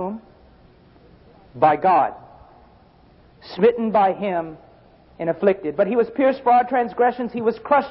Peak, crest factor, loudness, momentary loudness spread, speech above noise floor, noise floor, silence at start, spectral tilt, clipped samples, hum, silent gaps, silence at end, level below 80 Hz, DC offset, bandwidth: -2 dBFS; 18 dB; -20 LUFS; 10 LU; 32 dB; -52 dBFS; 0 s; -11 dB/octave; under 0.1%; none; none; 0 s; -58 dBFS; under 0.1%; 5.8 kHz